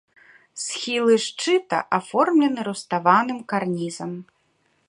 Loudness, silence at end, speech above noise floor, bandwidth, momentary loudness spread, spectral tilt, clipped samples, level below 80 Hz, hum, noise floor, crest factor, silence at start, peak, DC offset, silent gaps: -22 LUFS; 0.65 s; 45 dB; 11.5 kHz; 13 LU; -4 dB/octave; under 0.1%; -72 dBFS; none; -66 dBFS; 20 dB; 0.55 s; -2 dBFS; under 0.1%; none